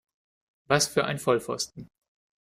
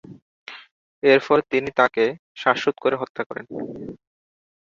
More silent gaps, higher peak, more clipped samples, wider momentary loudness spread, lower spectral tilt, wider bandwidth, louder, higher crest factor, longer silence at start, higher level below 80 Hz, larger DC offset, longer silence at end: second, none vs 0.22-0.46 s, 0.71-1.02 s, 2.19-2.35 s, 3.10-3.15 s, 3.26-3.30 s; second, -8 dBFS vs -2 dBFS; neither; second, 9 LU vs 22 LU; second, -3.5 dB/octave vs -5.5 dB/octave; first, 16 kHz vs 7.4 kHz; second, -26 LUFS vs -21 LUFS; about the same, 22 dB vs 22 dB; first, 0.7 s vs 0.05 s; about the same, -64 dBFS vs -64 dBFS; neither; second, 0.55 s vs 0.85 s